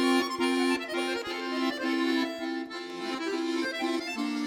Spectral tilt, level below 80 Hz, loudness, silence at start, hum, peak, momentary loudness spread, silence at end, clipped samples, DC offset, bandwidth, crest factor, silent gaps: -2.5 dB/octave; -72 dBFS; -30 LUFS; 0 s; none; -14 dBFS; 8 LU; 0 s; under 0.1%; under 0.1%; 16.5 kHz; 16 dB; none